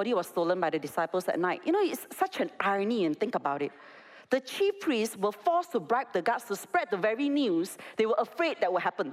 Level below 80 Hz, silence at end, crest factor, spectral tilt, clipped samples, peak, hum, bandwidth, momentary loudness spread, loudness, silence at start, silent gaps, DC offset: -82 dBFS; 0 s; 16 dB; -4.5 dB/octave; under 0.1%; -14 dBFS; none; 16 kHz; 4 LU; -30 LUFS; 0 s; none; under 0.1%